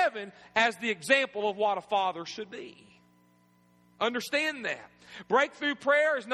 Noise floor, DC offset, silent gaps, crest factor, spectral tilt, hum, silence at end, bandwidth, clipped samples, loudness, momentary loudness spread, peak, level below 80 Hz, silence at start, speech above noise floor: -64 dBFS; under 0.1%; none; 22 dB; -3 dB/octave; 60 Hz at -65 dBFS; 0 s; 13 kHz; under 0.1%; -28 LUFS; 16 LU; -8 dBFS; -78 dBFS; 0 s; 35 dB